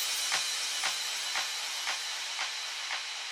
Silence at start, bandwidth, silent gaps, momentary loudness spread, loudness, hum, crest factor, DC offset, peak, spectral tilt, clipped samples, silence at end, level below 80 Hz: 0 s; 19.5 kHz; none; 5 LU; -31 LUFS; none; 18 dB; under 0.1%; -16 dBFS; 3.5 dB/octave; under 0.1%; 0 s; -86 dBFS